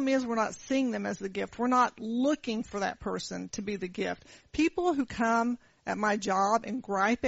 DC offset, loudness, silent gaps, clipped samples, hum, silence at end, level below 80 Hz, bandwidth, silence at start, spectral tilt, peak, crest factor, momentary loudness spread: under 0.1%; -30 LUFS; none; under 0.1%; none; 0 s; -60 dBFS; 8 kHz; 0 s; -4 dB/octave; -14 dBFS; 16 dB; 9 LU